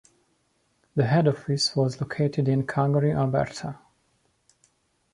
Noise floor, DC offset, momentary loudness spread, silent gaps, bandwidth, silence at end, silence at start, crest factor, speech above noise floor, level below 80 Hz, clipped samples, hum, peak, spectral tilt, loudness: -69 dBFS; under 0.1%; 10 LU; none; 11 kHz; 1.35 s; 0.95 s; 18 dB; 46 dB; -58 dBFS; under 0.1%; none; -8 dBFS; -6 dB/octave; -25 LUFS